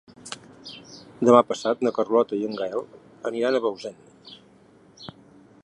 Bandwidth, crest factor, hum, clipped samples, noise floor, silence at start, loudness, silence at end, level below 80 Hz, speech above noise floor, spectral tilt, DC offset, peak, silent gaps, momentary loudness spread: 11 kHz; 24 dB; none; under 0.1%; -54 dBFS; 0.25 s; -23 LUFS; 0.55 s; -70 dBFS; 32 dB; -5.5 dB/octave; under 0.1%; -2 dBFS; none; 26 LU